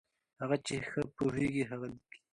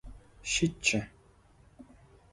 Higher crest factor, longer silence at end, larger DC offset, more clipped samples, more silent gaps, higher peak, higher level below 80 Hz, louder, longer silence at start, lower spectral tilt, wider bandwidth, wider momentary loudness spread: about the same, 20 dB vs 24 dB; second, 0.35 s vs 0.5 s; neither; neither; neither; second, -18 dBFS vs -12 dBFS; second, -64 dBFS vs -54 dBFS; second, -36 LUFS vs -30 LUFS; first, 0.4 s vs 0.05 s; first, -6 dB/octave vs -3 dB/octave; about the same, 11 kHz vs 11.5 kHz; second, 10 LU vs 16 LU